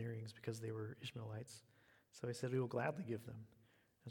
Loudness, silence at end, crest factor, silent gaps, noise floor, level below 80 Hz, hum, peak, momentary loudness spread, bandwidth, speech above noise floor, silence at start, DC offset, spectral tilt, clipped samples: -46 LUFS; 0 s; 20 dB; none; -73 dBFS; -82 dBFS; none; -26 dBFS; 18 LU; 19 kHz; 27 dB; 0 s; under 0.1%; -6 dB/octave; under 0.1%